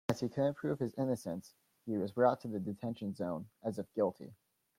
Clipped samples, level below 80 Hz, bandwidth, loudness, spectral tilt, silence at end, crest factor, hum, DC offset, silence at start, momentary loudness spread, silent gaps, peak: under 0.1%; -74 dBFS; 16.5 kHz; -37 LUFS; -7.5 dB/octave; 0.45 s; 20 dB; none; under 0.1%; 0.1 s; 12 LU; none; -16 dBFS